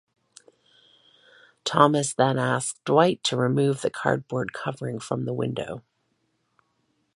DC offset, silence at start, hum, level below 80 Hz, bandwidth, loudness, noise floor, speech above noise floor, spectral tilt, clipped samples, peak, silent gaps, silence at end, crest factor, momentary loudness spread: under 0.1%; 1.65 s; none; -66 dBFS; 11.5 kHz; -24 LUFS; -72 dBFS; 48 dB; -5 dB/octave; under 0.1%; -2 dBFS; none; 1.35 s; 24 dB; 12 LU